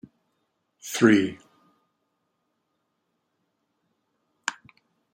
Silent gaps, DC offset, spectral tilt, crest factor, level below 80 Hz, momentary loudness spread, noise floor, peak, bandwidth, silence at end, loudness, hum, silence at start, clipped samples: none; under 0.1%; -4.5 dB/octave; 26 dB; -72 dBFS; 15 LU; -77 dBFS; -4 dBFS; 16 kHz; 0.6 s; -24 LUFS; none; 0.85 s; under 0.1%